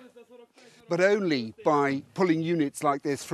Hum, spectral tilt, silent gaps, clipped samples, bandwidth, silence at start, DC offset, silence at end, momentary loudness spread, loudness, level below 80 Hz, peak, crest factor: none; -5.5 dB/octave; none; under 0.1%; 13 kHz; 0.05 s; under 0.1%; 0 s; 5 LU; -26 LUFS; -74 dBFS; -10 dBFS; 16 dB